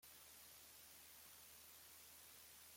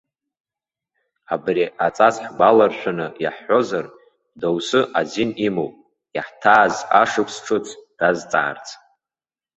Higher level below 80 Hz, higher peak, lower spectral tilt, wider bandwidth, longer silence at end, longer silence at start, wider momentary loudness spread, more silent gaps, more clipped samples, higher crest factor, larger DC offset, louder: second, -86 dBFS vs -62 dBFS; second, -50 dBFS vs -2 dBFS; second, 0 dB/octave vs -4.5 dB/octave; first, 16.5 kHz vs 8.2 kHz; second, 0 s vs 0.8 s; second, 0 s vs 1.3 s; second, 0 LU vs 14 LU; neither; neither; second, 14 dB vs 20 dB; neither; second, -60 LUFS vs -19 LUFS